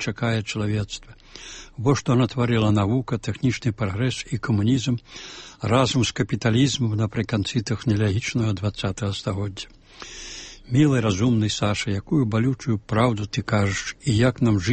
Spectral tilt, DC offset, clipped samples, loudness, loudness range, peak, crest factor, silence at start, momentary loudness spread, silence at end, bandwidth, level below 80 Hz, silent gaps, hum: -6 dB/octave; under 0.1%; under 0.1%; -23 LUFS; 3 LU; -6 dBFS; 16 dB; 0 s; 16 LU; 0 s; 8.8 kHz; -46 dBFS; none; none